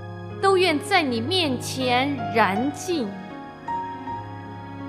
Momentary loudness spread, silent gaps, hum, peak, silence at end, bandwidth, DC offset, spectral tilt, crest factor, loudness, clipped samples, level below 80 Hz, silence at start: 17 LU; none; none; -4 dBFS; 0 s; 15 kHz; under 0.1%; -4.5 dB/octave; 20 dB; -23 LUFS; under 0.1%; -60 dBFS; 0 s